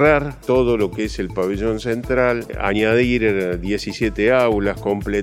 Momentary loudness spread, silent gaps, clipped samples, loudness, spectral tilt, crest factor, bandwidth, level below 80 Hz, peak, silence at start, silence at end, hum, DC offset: 7 LU; none; under 0.1%; -19 LUFS; -6.5 dB/octave; 18 dB; 16 kHz; -34 dBFS; 0 dBFS; 0 s; 0 s; none; under 0.1%